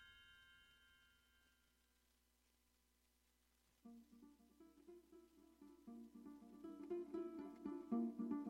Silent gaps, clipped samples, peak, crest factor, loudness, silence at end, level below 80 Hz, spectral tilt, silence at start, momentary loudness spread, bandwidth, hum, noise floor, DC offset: none; under 0.1%; -32 dBFS; 22 dB; -51 LUFS; 0 s; -84 dBFS; -7 dB/octave; 0 s; 23 LU; 16 kHz; 60 Hz at -85 dBFS; -81 dBFS; under 0.1%